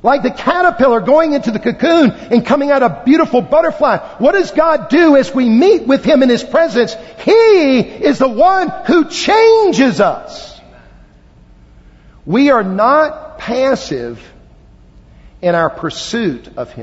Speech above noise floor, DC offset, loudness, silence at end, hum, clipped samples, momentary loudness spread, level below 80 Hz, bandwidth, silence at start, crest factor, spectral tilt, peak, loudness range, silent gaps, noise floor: 31 dB; under 0.1%; -12 LUFS; 0 s; none; under 0.1%; 10 LU; -44 dBFS; 8 kHz; 0.05 s; 12 dB; -5.5 dB/octave; 0 dBFS; 6 LU; none; -43 dBFS